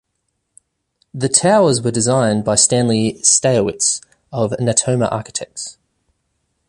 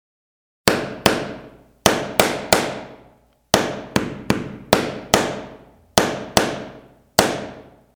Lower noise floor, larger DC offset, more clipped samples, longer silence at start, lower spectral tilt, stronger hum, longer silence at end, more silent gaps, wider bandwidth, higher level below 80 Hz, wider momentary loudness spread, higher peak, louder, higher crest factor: first, -72 dBFS vs -54 dBFS; neither; neither; first, 1.15 s vs 0.65 s; about the same, -4 dB/octave vs -3 dB/octave; neither; first, 1 s vs 0.35 s; neither; second, 11.5 kHz vs over 20 kHz; second, -52 dBFS vs -44 dBFS; about the same, 14 LU vs 14 LU; about the same, 0 dBFS vs 0 dBFS; first, -15 LUFS vs -20 LUFS; about the same, 18 dB vs 22 dB